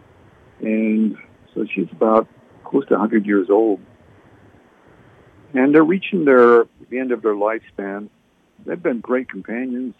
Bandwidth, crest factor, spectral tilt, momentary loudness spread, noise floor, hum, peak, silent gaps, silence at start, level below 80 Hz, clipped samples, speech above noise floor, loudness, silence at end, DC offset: 4.3 kHz; 18 dB; -9 dB/octave; 16 LU; -50 dBFS; none; -2 dBFS; none; 0.6 s; -66 dBFS; under 0.1%; 33 dB; -18 LUFS; 0.1 s; under 0.1%